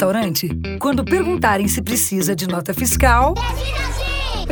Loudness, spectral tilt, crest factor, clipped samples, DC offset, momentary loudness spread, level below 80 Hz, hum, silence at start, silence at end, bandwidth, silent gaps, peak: -18 LUFS; -4 dB/octave; 18 dB; under 0.1%; under 0.1%; 8 LU; -26 dBFS; none; 0 s; 0 s; over 20 kHz; none; 0 dBFS